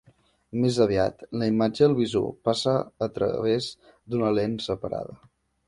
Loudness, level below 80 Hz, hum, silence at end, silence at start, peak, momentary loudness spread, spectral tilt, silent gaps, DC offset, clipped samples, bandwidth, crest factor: -25 LUFS; -54 dBFS; none; 0.55 s; 0.55 s; -8 dBFS; 11 LU; -6.5 dB/octave; none; under 0.1%; under 0.1%; 11.5 kHz; 18 dB